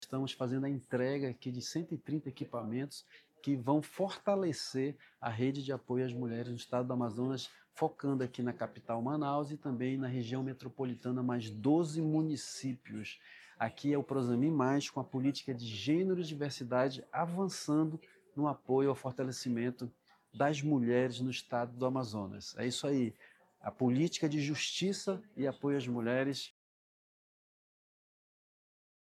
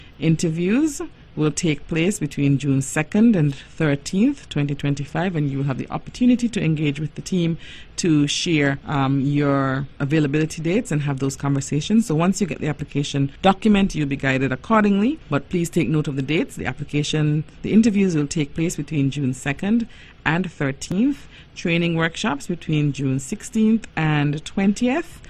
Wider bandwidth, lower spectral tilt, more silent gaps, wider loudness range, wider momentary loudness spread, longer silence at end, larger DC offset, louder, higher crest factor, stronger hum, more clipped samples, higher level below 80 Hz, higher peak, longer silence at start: about the same, 14 kHz vs 13 kHz; about the same, -6 dB/octave vs -6 dB/octave; neither; about the same, 3 LU vs 3 LU; about the same, 9 LU vs 7 LU; first, 2.55 s vs 0.05 s; neither; second, -36 LUFS vs -21 LUFS; about the same, 18 dB vs 18 dB; neither; neither; second, -80 dBFS vs -44 dBFS; second, -18 dBFS vs -2 dBFS; about the same, 0 s vs 0 s